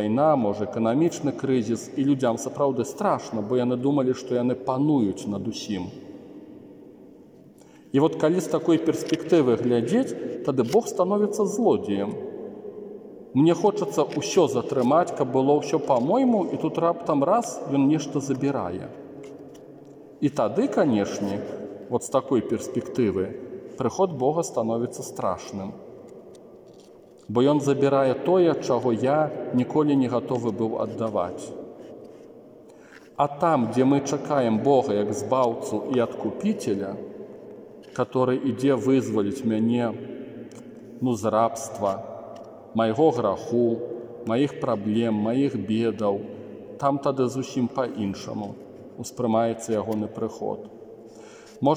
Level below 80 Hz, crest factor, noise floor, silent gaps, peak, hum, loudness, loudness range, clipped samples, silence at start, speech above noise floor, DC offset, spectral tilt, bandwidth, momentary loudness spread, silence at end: -68 dBFS; 18 dB; -50 dBFS; none; -6 dBFS; none; -24 LUFS; 6 LU; under 0.1%; 0 s; 27 dB; under 0.1%; -6.5 dB/octave; 16 kHz; 18 LU; 0 s